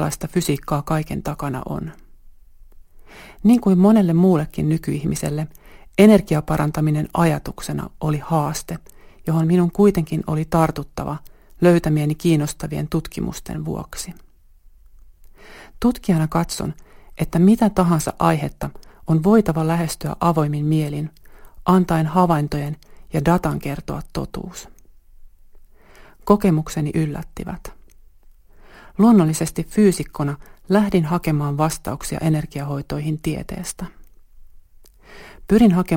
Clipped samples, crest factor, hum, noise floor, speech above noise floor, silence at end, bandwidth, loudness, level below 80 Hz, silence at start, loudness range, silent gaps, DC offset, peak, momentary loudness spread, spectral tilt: under 0.1%; 20 dB; none; -48 dBFS; 30 dB; 0 s; 17 kHz; -20 LUFS; -40 dBFS; 0 s; 7 LU; none; under 0.1%; 0 dBFS; 16 LU; -7 dB/octave